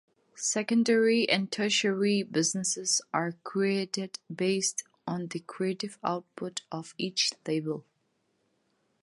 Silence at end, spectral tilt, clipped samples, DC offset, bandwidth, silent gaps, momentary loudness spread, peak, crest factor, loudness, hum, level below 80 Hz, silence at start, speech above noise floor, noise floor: 1.2 s; -3 dB/octave; under 0.1%; under 0.1%; 11.5 kHz; none; 12 LU; -10 dBFS; 20 dB; -29 LUFS; none; -80 dBFS; 0.35 s; 45 dB; -75 dBFS